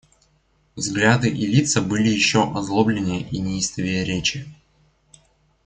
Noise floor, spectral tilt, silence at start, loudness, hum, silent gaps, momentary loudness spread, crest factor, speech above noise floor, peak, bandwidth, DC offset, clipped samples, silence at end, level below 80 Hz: -62 dBFS; -4.5 dB/octave; 0.75 s; -20 LUFS; none; none; 8 LU; 20 dB; 42 dB; -2 dBFS; 9.6 kHz; under 0.1%; under 0.1%; 1.1 s; -50 dBFS